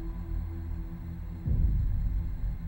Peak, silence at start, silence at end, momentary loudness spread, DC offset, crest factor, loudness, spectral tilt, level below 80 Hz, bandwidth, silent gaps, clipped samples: -16 dBFS; 0 s; 0 s; 10 LU; under 0.1%; 14 dB; -34 LUFS; -10 dB/octave; -32 dBFS; 16 kHz; none; under 0.1%